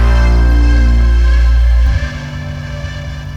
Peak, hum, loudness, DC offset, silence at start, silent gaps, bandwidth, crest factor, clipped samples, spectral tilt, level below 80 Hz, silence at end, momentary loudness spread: -2 dBFS; none; -13 LUFS; under 0.1%; 0 s; none; 6.8 kHz; 8 dB; under 0.1%; -7 dB/octave; -10 dBFS; 0 s; 12 LU